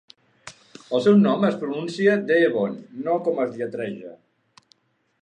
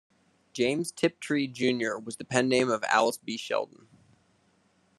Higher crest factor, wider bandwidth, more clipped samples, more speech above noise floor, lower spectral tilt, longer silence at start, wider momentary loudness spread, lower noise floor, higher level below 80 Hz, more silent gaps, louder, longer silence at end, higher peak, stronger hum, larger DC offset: second, 18 dB vs 24 dB; second, 9.2 kHz vs 13 kHz; neither; about the same, 41 dB vs 39 dB; first, -7 dB/octave vs -4 dB/octave; about the same, 0.45 s vs 0.55 s; first, 15 LU vs 10 LU; second, -63 dBFS vs -67 dBFS; about the same, -72 dBFS vs -74 dBFS; neither; first, -22 LUFS vs -28 LUFS; second, 1.05 s vs 1.35 s; about the same, -6 dBFS vs -6 dBFS; neither; neither